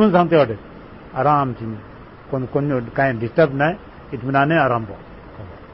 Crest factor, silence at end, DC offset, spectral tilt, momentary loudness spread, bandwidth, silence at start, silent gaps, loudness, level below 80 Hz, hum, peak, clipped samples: 16 dB; 0 s; 0.1%; -12 dB/octave; 22 LU; 5.8 kHz; 0 s; none; -19 LUFS; -46 dBFS; none; -4 dBFS; under 0.1%